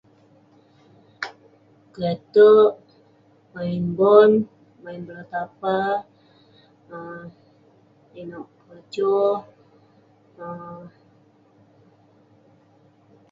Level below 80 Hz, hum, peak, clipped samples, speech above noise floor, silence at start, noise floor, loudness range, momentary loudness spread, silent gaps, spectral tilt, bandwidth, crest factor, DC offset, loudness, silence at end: -68 dBFS; none; -2 dBFS; under 0.1%; 37 dB; 1.2 s; -57 dBFS; 12 LU; 27 LU; none; -8 dB/octave; 5.8 kHz; 22 dB; under 0.1%; -19 LUFS; 2.45 s